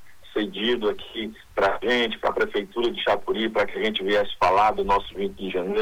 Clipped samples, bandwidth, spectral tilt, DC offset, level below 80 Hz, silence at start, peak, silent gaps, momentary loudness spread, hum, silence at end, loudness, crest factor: under 0.1%; 19 kHz; -5 dB/octave; under 0.1%; -46 dBFS; 0 s; -8 dBFS; none; 10 LU; none; 0 s; -24 LUFS; 16 dB